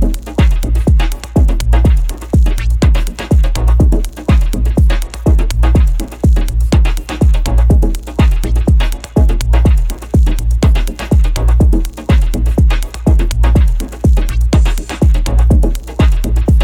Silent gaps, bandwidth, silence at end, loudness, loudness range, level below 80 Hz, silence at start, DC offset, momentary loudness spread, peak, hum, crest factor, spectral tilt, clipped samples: none; 15 kHz; 0 s; -13 LUFS; 0 LU; -12 dBFS; 0 s; under 0.1%; 4 LU; 0 dBFS; none; 10 dB; -7 dB/octave; under 0.1%